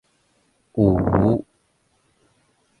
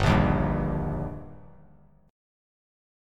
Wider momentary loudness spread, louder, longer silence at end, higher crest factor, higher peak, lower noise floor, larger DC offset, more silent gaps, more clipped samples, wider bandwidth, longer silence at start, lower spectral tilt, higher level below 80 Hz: second, 8 LU vs 19 LU; first, -20 LUFS vs -27 LUFS; first, 1.4 s vs 1 s; about the same, 20 dB vs 20 dB; first, -2 dBFS vs -10 dBFS; first, -65 dBFS vs -57 dBFS; neither; neither; neither; second, 9.4 kHz vs 11 kHz; first, 0.75 s vs 0 s; first, -11 dB/octave vs -7.5 dB/octave; about the same, -40 dBFS vs -36 dBFS